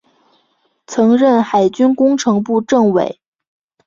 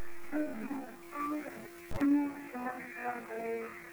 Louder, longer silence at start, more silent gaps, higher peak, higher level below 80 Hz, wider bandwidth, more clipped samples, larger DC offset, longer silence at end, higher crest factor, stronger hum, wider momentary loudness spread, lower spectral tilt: first, -14 LUFS vs -37 LUFS; first, 0.9 s vs 0 s; neither; first, -2 dBFS vs -20 dBFS; about the same, -58 dBFS vs -60 dBFS; second, 7.6 kHz vs over 20 kHz; neither; neither; first, 0.75 s vs 0 s; about the same, 14 dB vs 16 dB; neither; second, 6 LU vs 13 LU; about the same, -6 dB/octave vs -6 dB/octave